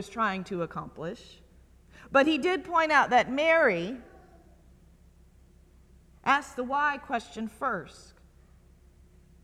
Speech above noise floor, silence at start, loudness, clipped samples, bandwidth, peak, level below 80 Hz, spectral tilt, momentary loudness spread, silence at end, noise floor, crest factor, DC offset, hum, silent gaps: 30 dB; 0 s; -27 LUFS; under 0.1%; 13.5 kHz; -8 dBFS; -58 dBFS; -4.5 dB/octave; 17 LU; 1.5 s; -57 dBFS; 22 dB; under 0.1%; none; none